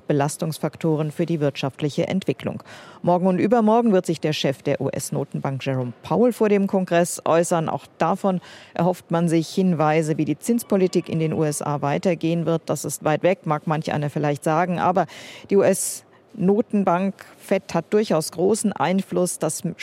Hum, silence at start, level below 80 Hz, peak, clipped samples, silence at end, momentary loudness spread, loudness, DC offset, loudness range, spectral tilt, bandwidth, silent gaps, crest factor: none; 0.1 s; -66 dBFS; -6 dBFS; under 0.1%; 0 s; 8 LU; -22 LUFS; under 0.1%; 1 LU; -6 dB/octave; 16.5 kHz; none; 16 dB